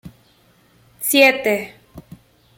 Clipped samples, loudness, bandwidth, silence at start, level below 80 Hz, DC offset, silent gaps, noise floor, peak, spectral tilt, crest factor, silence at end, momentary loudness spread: under 0.1%; -16 LUFS; 17 kHz; 0.05 s; -58 dBFS; under 0.1%; none; -55 dBFS; -2 dBFS; -2 dB/octave; 20 dB; 0.6 s; 14 LU